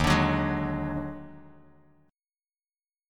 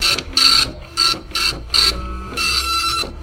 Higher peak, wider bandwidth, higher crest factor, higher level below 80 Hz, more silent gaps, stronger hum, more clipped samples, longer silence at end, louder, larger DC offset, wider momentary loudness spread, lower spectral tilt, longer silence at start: second, -10 dBFS vs 0 dBFS; about the same, 16.5 kHz vs 17 kHz; about the same, 20 dB vs 18 dB; second, -42 dBFS vs -32 dBFS; neither; neither; neither; first, 1.65 s vs 0 s; second, -28 LUFS vs -15 LUFS; neither; first, 20 LU vs 9 LU; first, -6 dB/octave vs -1 dB/octave; about the same, 0 s vs 0 s